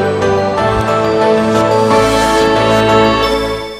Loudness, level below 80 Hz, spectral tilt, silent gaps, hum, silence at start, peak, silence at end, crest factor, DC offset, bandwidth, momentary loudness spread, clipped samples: -11 LUFS; -32 dBFS; -5 dB/octave; none; none; 0 s; 0 dBFS; 0 s; 12 dB; 0.3%; 15.5 kHz; 4 LU; under 0.1%